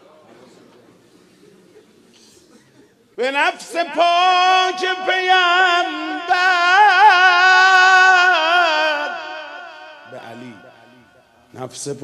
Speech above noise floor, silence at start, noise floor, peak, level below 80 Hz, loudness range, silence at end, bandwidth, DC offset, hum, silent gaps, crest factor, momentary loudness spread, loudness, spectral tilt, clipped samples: 35 dB; 3.2 s; -52 dBFS; 0 dBFS; -76 dBFS; 14 LU; 0.05 s; 12.5 kHz; under 0.1%; none; none; 16 dB; 21 LU; -13 LUFS; -1 dB/octave; under 0.1%